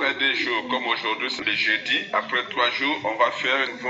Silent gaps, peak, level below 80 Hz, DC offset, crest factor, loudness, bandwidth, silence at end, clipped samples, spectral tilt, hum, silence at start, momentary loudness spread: none; -6 dBFS; -72 dBFS; under 0.1%; 18 dB; -22 LUFS; 8 kHz; 0 s; under 0.1%; 1 dB/octave; none; 0 s; 4 LU